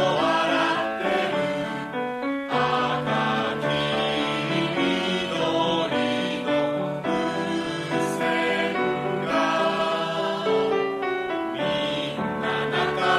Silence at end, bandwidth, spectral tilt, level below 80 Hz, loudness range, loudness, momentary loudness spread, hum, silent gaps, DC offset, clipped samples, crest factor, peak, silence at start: 0 s; 14 kHz; -5 dB/octave; -58 dBFS; 1 LU; -24 LUFS; 5 LU; none; none; under 0.1%; under 0.1%; 14 dB; -10 dBFS; 0 s